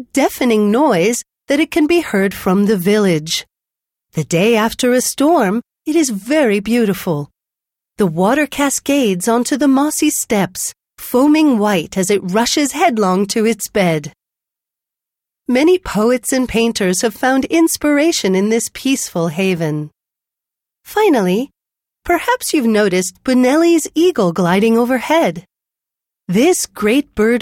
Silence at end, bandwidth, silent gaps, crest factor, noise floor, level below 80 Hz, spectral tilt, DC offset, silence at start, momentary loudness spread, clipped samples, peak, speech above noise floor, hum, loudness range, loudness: 0 s; 17.5 kHz; none; 12 dB; -85 dBFS; -48 dBFS; -4.5 dB/octave; under 0.1%; 0 s; 7 LU; under 0.1%; -2 dBFS; 71 dB; none; 3 LU; -15 LUFS